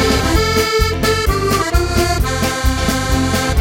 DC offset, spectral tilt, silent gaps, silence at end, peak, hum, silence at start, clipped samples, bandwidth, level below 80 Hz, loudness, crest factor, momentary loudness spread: under 0.1%; -4.5 dB/octave; none; 0 s; -2 dBFS; none; 0 s; under 0.1%; 17 kHz; -20 dBFS; -15 LUFS; 14 dB; 3 LU